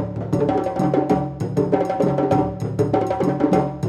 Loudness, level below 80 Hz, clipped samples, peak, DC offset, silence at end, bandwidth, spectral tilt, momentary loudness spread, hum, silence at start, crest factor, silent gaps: -20 LUFS; -46 dBFS; under 0.1%; -4 dBFS; under 0.1%; 0 s; 12.5 kHz; -8.5 dB/octave; 4 LU; none; 0 s; 16 dB; none